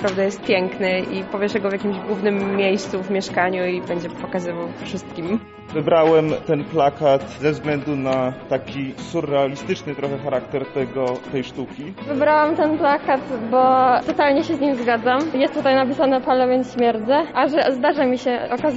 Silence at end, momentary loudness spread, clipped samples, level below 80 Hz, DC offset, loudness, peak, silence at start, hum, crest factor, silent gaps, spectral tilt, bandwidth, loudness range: 0 s; 10 LU; under 0.1%; -54 dBFS; under 0.1%; -20 LUFS; -6 dBFS; 0 s; none; 14 dB; none; -4.5 dB/octave; 8 kHz; 6 LU